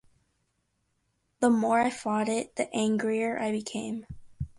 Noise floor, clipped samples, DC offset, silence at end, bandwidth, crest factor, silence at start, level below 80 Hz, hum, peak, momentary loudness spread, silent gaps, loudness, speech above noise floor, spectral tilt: -76 dBFS; under 0.1%; under 0.1%; 0.1 s; 11.5 kHz; 18 dB; 1.4 s; -56 dBFS; none; -12 dBFS; 11 LU; none; -28 LUFS; 48 dB; -5 dB/octave